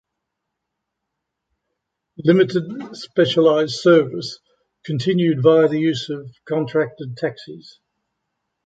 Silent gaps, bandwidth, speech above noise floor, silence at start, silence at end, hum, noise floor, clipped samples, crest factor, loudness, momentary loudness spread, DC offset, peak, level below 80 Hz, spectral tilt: none; 8 kHz; 61 dB; 2.2 s; 1.05 s; none; -80 dBFS; under 0.1%; 18 dB; -18 LUFS; 17 LU; under 0.1%; -2 dBFS; -64 dBFS; -6.5 dB/octave